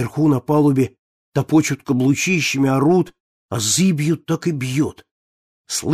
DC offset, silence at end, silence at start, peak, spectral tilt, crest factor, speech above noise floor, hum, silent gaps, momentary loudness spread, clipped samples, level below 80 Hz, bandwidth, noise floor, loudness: under 0.1%; 0 s; 0 s; -4 dBFS; -5 dB/octave; 14 dB; over 73 dB; none; 0.99-1.32 s, 3.20-3.49 s, 5.11-5.64 s; 8 LU; under 0.1%; -56 dBFS; 15.5 kHz; under -90 dBFS; -18 LUFS